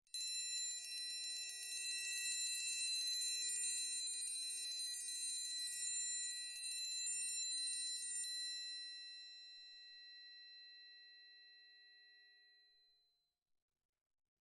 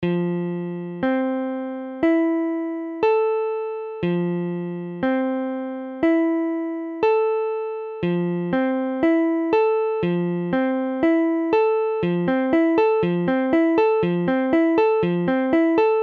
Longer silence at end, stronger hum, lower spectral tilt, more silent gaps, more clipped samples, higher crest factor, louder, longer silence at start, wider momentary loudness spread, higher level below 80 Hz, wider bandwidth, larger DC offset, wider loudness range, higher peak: first, 1.85 s vs 0 s; neither; second, 8 dB/octave vs -9.5 dB/octave; neither; neither; about the same, 16 dB vs 14 dB; second, -41 LUFS vs -21 LUFS; first, 0.15 s vs 0 s; first, 18 LU vs 9 LU; second, under -90 dBFS vs -58 dBFS; first, 12 kHz vs 4.7 kHz; neither; first, 18 LU vs 4 LU; second, -30 dBFS vs -8 dBFS